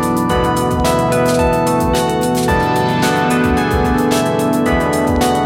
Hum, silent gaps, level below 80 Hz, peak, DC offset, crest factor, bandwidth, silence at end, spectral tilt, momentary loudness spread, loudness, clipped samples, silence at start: none; none; -28 dBFS; -2 dBFS; under 0.1%; 12 dB; 17 kHz; 0 s; -5.5 dB/octave; 1 LU; -14 LUFS; under 0.1%; 0 s